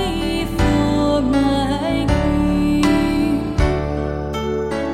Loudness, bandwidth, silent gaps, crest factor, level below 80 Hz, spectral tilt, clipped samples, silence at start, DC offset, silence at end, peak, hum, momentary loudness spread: -18 LUFS; 14 kHz; none; 14 dB; -26 dBFS; -6.5 dB/octave; under 0.1%; 0 s; under 0.1%; 0 s; -4 dBFS; none; 6 LU